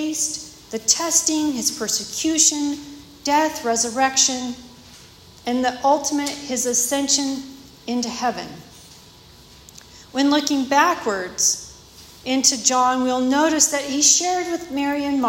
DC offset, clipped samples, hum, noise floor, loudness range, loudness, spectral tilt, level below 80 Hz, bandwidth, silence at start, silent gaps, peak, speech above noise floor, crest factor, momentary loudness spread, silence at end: under 0.1%; under 0.1%; none; -46 dBFS; 6 LU; -19 LUFS; -1 dB/octave; -56 dBFS; 16.5 kHz; 0 s; none; 0 dBFS; 26 dB; 20 dB; 16 LU; 0 s